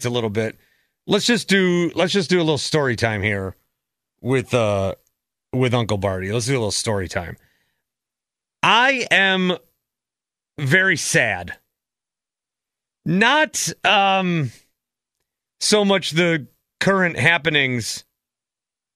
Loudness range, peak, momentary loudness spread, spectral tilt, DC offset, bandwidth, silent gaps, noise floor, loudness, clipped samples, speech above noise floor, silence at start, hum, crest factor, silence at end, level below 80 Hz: 4 LU; 0 dBFS; 13 LU; -4 dB/octave; under 0.1%; 14 kHz; none; -89 dBFS; -19 LUFS; under 0.1%; 70 dB; 0 s; none; 20 dB; 0.95 s; -56 dBFS